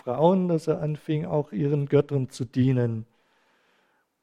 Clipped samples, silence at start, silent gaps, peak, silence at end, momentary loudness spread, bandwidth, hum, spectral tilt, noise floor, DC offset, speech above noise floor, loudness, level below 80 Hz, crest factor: under 0.1%; 0.05 s; none; -6 dBFS; 1.2 s; 7 LU; 11 kHz; none; -8.5 dB/octave; -68 dBFS; under 0.1%; 44 dB; -25 LUFS; -62 dBFS; 20 dB